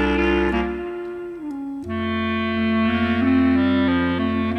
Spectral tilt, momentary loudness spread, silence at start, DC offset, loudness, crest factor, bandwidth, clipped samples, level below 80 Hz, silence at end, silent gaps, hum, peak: -7.5 dB/octave; 13 LU; 0 s; under 0.1%; -21 LUFS; 12 dB; 6.2 kHz; under 0.1%; -38 dBFS; 0 s; none; none; -8 dBFS